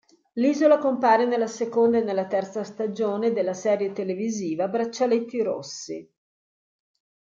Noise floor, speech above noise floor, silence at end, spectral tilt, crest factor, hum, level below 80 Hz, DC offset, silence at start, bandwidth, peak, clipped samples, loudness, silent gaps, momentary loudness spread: under -90 dBFS; over 67 dB; 1.35 s; -5 dB/octave; 18 dB; none; -76 dBFS; under 0.1%; 0.35 s; 7.6 kHz; -6 dBFS; under 0.1%; -24 LUFS; none; 13 LU